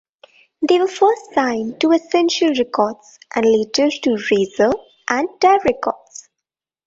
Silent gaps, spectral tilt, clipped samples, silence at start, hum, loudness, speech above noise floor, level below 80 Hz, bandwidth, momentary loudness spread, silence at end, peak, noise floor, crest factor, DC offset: none; -4 dB/octave; under 0.1%; 0.6 s; none; -17 LUFS; 67 dB; -58 dBFS; 8 kHz; 10 LU; 0.9 s; 0 dBFS; -84 dBFS; 16 dB; under 0.1%